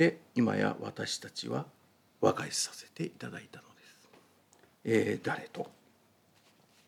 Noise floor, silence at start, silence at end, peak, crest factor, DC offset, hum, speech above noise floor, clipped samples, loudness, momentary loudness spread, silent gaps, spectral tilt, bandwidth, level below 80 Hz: -67 dBFS; 0 s; 1.15 s; -12 dBFS; 22 dB; under 0.1%; none; 34 dB; under 0.1%; -34 LUFS; 15 LU; none; -4.5 dB/octave; 17.5 kHz; -82 dBFS